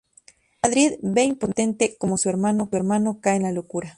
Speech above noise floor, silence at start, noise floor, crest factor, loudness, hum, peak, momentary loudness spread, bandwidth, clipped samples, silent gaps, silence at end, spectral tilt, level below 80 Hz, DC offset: 33 dB; 0.65 s; -55 dBFS; 18 dB; -22 LUFS; none; -4 dBFS; 4 LU; 11.5 kHz; under 0.1%; none; 0.05 s; -4.5 dB/octave; -58 dBFS; under 0.1%